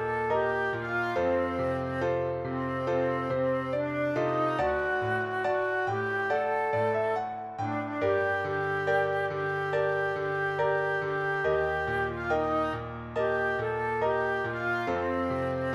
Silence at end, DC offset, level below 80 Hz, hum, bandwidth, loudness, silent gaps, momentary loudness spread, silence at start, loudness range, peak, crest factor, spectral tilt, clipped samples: 0 s; under 0.1%; -54 dBFS; none; 12 kHz; -29 LUFS; none; 3 LU; 0 s; 1 LU; -16 dBFS; 14 dB; -7 dB/octave; under 0.1%